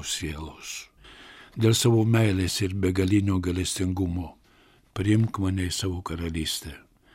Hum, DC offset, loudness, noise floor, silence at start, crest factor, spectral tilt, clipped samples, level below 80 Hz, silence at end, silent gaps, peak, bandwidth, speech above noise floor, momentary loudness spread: none; under 0.1%; -25 LUFS; -59 dBFS; 0 s; 18 dB; -5 dB/octave; under 0.1%; -46 dBFS; 0.35 s; none; -8 dBFS; 16.5 kHz; 34 dB; 17 LU